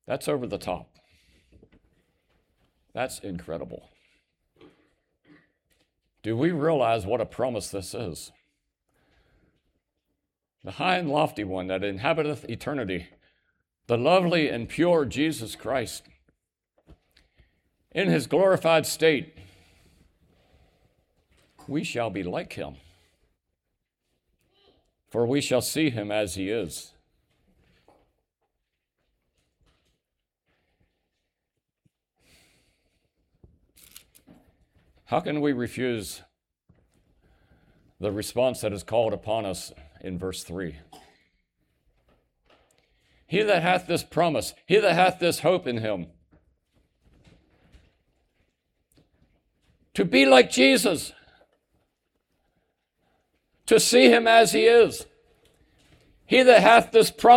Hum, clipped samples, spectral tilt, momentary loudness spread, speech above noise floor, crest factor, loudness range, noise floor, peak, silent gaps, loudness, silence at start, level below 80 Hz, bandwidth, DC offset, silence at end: none; under 0.1%; -4 dB/octave; 20 LU; 61 dB; 24 dB; 18 LU; -83 dBFS; -4 dBFS; none; -23 LUFS; 0.1 s; -60 dBFS; 18 kHz; under 0.1%; 0 s